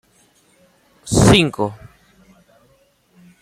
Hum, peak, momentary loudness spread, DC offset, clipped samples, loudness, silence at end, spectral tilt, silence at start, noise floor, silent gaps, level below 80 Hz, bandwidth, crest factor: none; -2 dBFS; 15 LU; under 0.1%; under 0.1%; -15 LUFS; 1.65 s; -5 dB/octave; 1.05 s; -58 dBFS; none; -36 dBFS; 15.5 kHz; 20 dB